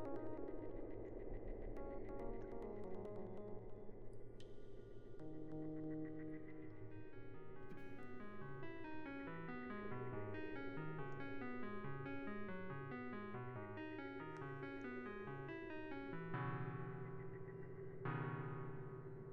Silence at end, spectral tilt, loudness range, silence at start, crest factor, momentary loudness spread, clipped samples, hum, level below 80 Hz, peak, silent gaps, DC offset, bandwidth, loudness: 0 s; -7 dB/octave; 5 LU; 0 s; 14 dB; 9 LU; under 0.1%; none; -60 dBFS; -34 dBFS; none; under 0.1%; 6.2 kHz; -51 LUFS